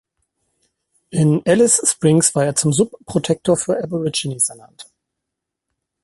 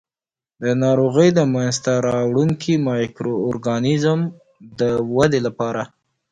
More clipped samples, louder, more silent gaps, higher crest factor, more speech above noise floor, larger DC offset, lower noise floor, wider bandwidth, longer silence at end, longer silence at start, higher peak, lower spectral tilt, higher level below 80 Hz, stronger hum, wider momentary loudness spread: neither; about the same, -17 LUFS vs -19 LUFS; neither; about the same, 18 dB vs 18 dB; second, 64 dB vs over 72 dB; neither; second, -81 dBFS vs under -90 dBFS; first, 12 kHz vs 10 kHz; first, 1.2 s vs 0.45 s; first, 1.1 s vs 0.6 s; about the same, -2 dBFS vs -2 dBFS; second, -4.5 dB/octave vs -6.5 dB/octave; about the same, -56 dBFS vs -54 dBFS; neither; about the same, 8 LU vs 9 LU